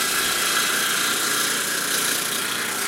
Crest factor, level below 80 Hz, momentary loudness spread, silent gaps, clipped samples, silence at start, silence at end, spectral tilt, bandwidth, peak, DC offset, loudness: 16 dB; -60 dBFS; 3 LU; none; under 0.1%; 0 s; 0 s; 0.5 dB/octave; 16.5 kHz; -6 dBFS; under 0.1%; -20 LUFS